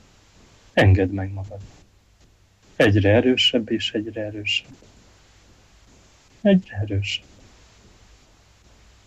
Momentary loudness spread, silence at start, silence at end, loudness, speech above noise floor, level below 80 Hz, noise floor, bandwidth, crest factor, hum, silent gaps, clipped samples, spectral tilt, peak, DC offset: 13 LU; 0.75 s; 1.9 s; -21 LUFS; 36 dB; -50 dBFS; -56 dBFS; 9.6 kHz; 18 dB; none; none; under 0.1%; -6 dB/octave; -6 dBFS; under 0.1%